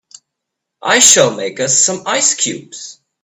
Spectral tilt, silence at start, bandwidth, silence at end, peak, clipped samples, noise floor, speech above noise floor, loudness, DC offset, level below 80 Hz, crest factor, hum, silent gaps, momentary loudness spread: -1 dB/octave; 0.85 s; over 20 kHz; 0.3 s; 0 dBFS; 0.2%; -78 dBFS; 64 dB; -11 LUFS; under 0.1%; -60 dBFS; 16 dB; none; none; 22 LU